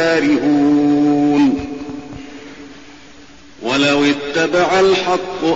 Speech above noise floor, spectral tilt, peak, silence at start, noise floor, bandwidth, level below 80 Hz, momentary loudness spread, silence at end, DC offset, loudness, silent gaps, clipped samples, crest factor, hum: 28 dB; -3.5 dB/octave; -4 dBFS; 0 s; -42 dBFS; 8 kHz; -48 dBFS; 20 LU; 0 s; 0.5%; -14 LUFS; none; under 0.1%; 10 dB; none